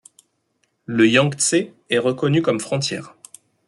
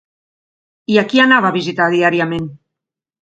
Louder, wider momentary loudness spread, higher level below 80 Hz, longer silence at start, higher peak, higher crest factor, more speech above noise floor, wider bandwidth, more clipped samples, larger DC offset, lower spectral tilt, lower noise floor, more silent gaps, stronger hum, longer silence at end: second, -19 LUFS vs -14 LUFS; second, 11 LU vs 14 LU; second, -62 dBFS vs -56 dBFS; about the same, 0.9 s vs 0.9 s; about the same, -2 dBFS vs 0 dBFS; about the same, 18 dB vs 16 dB; second, 50 dB vs 69 dB; first, 12 kHz vs 8.2 kHz; neither; neither; second, -4 dB/octave vs -5.5 dB/octave; second, -69 dBFS vs -83 dBFS; neither; neither; about the same, 0.6 s vs 0.65 s